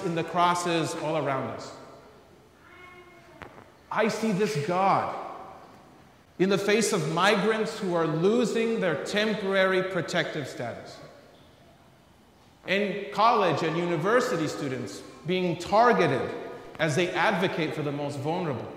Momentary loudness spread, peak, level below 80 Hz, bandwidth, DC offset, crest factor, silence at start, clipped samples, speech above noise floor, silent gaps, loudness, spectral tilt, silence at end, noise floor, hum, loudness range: 16 LU; -8 dBFS; -66 dBFS; 16 kHz; under 0.1%; 20 dB; 0 s; under 0.1%; 31 dB; none; -26 LUFS; -5 dB/octave; 0 s; -57 dBFS; none; 7 LU